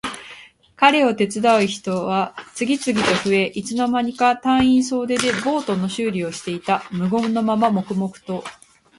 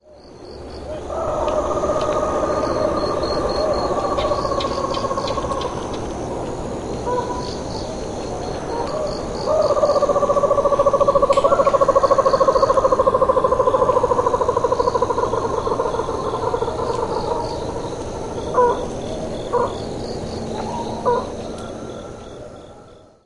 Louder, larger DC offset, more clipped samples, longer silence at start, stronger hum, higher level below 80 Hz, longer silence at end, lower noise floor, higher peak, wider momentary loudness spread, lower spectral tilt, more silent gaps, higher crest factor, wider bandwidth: about the same, -20 LUFS vs -20 LUFS; neither; neither; about the same, 0.05 s vs 0.1 s; neither; second, -54 dBFS vs -38 dBFS; first, 0.45 s vs 0.3 s; about the same, -45 dBFS vs -44 dBFS; about the same, 0 dBFS vs 0 dBFS; about the same, 11 LU vs 12 LU; about the same, -4.5 dB/octave vs -5.5 dB/octave; neither; about the same, 20 dB vs 20 dB; about the same, 11.5 kHz vs 11.5 kHz